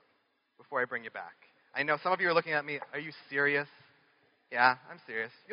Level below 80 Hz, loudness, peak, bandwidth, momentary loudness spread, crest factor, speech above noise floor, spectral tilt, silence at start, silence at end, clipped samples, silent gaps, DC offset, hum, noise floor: -86 dBFS; -31 LUFS; -10 dBFS; 5.4 kHz; 13 LU; 24 dB; 42 dB; -1.5 dB/octave; 0.7 s; 0 s; under 0.1%; none; under 0.1%; none; -74 dBFS